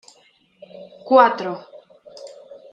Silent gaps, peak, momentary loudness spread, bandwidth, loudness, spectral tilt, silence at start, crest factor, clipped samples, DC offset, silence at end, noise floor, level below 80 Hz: none; -2 dBFS; 26 LU; 8.4 kHz; -17 LUFS; -5.5 dB/octave; 0.8 s; 20 dB; under 0.1%; under 0.1%; 0.45 s; -57 dBFS; -74 dBFS